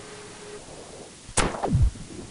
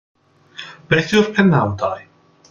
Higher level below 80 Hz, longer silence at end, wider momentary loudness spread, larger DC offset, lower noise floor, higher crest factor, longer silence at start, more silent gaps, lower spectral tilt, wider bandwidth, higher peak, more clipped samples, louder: first, -34 dBFS vs -52 dBFS; second, 0 s vs 0.5 s; second, 17 LU vs 20 LU; neither; first, -43 dBFS vs -39 dBFS; first, 24 dB vs 18 dB; second, 0 s vs 0.6 s; neither; second, -4.5 dB/octave vs -6 dB/octave; about the same, 11 kHz vs 10.5 kHz; second, -4 dBFS vs 0 dBFS; neither; second, -26 LUFS vs -16 LUFS